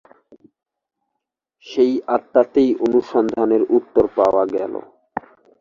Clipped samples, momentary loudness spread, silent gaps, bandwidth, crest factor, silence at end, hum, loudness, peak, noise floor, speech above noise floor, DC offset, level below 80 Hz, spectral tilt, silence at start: under 0.1%; 16 LU; none; 7.2 kHz; 18 dB; 0.4 s; none; -18 LUFS; -2 dBFS; -80 dBFS; 63 dB; under 0.1%; -54 dBFS; -7 dB/octave; 1.65 s